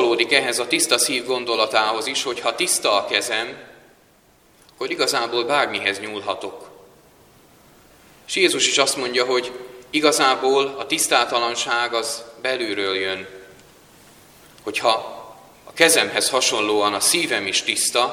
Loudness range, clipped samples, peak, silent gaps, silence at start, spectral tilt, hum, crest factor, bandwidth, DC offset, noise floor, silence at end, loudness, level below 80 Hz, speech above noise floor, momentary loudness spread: 6 LU; under 0.1%; 0 dBFS; none; 0 s; -1 dB/octave; none; 22 dB; 18 kHz; under 0.1%; -55 dBFS; 0 s; -19 LUFS; -64 dBFS; 35 dB; 12 LU